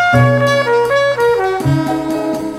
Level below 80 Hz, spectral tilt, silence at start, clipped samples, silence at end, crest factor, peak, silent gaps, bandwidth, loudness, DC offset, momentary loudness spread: -42 dBFS; -6.5 dB/octave; 0 s; under 0.1%; 0 s; 12 dB; 0 dBFS; none; 15.5 kHz; -13 LUFS; under 0.1%; 7 LU